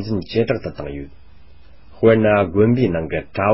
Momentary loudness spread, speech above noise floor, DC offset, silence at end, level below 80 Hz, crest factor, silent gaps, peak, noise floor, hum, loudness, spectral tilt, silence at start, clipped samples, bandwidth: 15 LU; 30 dB; 1%; 0 s; -40 dBFS; 18 dB; none; 0 dBFS; -47 dBFS; none; -18 LUFS; -12 dB/octave; 0 s; under 0.1%; 5.8 kHz